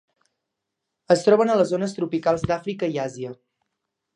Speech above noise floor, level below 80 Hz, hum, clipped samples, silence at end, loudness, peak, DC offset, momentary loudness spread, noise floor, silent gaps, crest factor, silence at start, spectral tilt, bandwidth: 60 dB; -56 dBFS; none; under 0.1%; 0.8 s; -22 LUFS; -4 dBFS; under 0.1%; 12 LU; -82 dBFS; none; 20 dB; 1.1 s; -6 dB/octave; 11 kHz